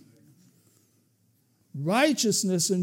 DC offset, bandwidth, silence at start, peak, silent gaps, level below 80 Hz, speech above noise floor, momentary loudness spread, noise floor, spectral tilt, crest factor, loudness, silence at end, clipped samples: under 0.1%; 16.5 kHz; 1.75 s; -10 dBFS; none; -86 dBFS; 43 dB; 12 LU; -67 dBFS; -3.5 dB/octave; 18 dB; -24 LUFS; 0 s; under 0.1%